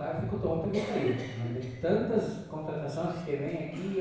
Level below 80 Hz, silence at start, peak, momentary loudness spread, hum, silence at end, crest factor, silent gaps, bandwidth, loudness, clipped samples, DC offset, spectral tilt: -54 dBFS; 0 s; -14 dBFS; 7 LU; none; 0 s; 18 dB; none; 8 kHz; -32 LUFS; under 0.1%; under 0.1%; -7.5 dB/octave